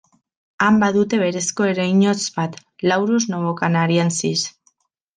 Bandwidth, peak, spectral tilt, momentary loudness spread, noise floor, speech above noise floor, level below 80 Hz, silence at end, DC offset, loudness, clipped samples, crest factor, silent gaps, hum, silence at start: 9.8 kHz; -4 dBFS; -4.5 dB/octave; 7 LU; -63 dBFS; 45 dB; -62 dBFS; 0.65 s; under 0.1%; -19 LUFS; under 0.1%; 16 dB; none; none; 0.6 s